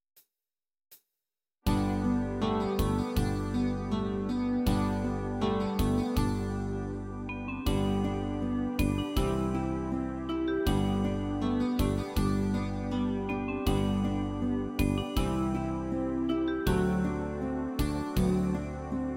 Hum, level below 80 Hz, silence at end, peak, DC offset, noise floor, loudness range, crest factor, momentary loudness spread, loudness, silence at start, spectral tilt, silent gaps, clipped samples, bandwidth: none; -38 dBFS; 0 s; -14 dBFS; under 0.1%; under -90 dBFS; 1 LU; 16 dB; 5 LU; -31 LUFS; 0.9 s; -7 dB/octave; none; under 0.1%; 16.5 kHz